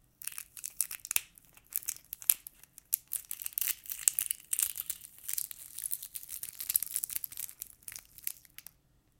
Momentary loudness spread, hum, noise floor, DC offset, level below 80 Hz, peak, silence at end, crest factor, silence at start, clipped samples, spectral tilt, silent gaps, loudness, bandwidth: 15 LU; none; -68 dBFS; under 0.1%; -72 dBFS; 0 dBFS; 0.8 s; 38 dB; 0.2 s; under 0.1%; 2.5 dB/octave; none; -34 LUFS; 17 kHz